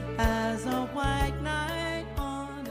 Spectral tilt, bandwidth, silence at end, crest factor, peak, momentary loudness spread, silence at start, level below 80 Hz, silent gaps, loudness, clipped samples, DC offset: -5.5 dB/octave; 15.5 kHz; 0 s; 16 dB; -12 dBFS; 7 LU; 0 s; -36 dBFS; none; -30 LUFS; under 0.1%; under 0.1%